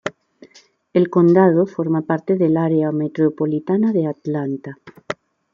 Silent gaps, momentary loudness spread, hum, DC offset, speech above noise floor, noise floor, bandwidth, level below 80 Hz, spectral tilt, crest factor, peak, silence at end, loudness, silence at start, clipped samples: none; 17 LU; none; under 0.1%; 34 dB; -51 dBFS; 7.2 kHz; -66 dBFS; -9 dB/octave; 16 dB; -2 dBFS; 0.4 s; -18 LUFS; 0.05 s; under 0.1%